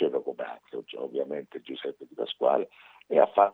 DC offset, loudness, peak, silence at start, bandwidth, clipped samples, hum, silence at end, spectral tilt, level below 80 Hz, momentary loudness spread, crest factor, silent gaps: under 0.1%; -29 LUFS; -6 dBFS; 0 s; 4.2 kHz; under 0.1%; none; 0 s; -7 dB/octave; -86 dBFS; 16 LU; 22 dB; none